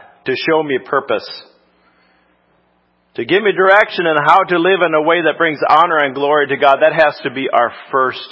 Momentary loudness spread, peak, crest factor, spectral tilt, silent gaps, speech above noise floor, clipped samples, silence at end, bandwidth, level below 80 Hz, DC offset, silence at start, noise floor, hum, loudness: 10 LU; 0 dBFS; 14 dB; -6.5 dB/octave; none; 45 dB; 0.1%; 0.05 s; 8 kHz; -64 dBFS; under 0.1%; 0.25 s; -59 dBFS; none; -13 LUFS